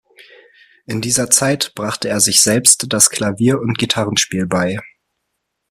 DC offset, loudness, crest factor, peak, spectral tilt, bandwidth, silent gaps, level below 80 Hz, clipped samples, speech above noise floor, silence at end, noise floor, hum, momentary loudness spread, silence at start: under 0.1%; -14 LUFS; 18 dB; 0 dBFS; -2.5 dB/octave; 16 kHz; none; -52 dBFS; under 0.1%; 58 dB; 0.85 s; -74 dBFS; none; 11 LU; 0.9 s